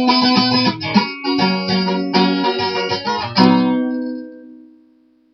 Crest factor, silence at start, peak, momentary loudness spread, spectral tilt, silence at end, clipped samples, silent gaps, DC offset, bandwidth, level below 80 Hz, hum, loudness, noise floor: 18 dB; 0 s; 0 dBFS; 9 LU; -6 dB/octave; 0.8 s; under 0.1%; none; under 0.1%; 6.4 kHz; -60 dBFS; none; -16 LUFS; -54 dBFS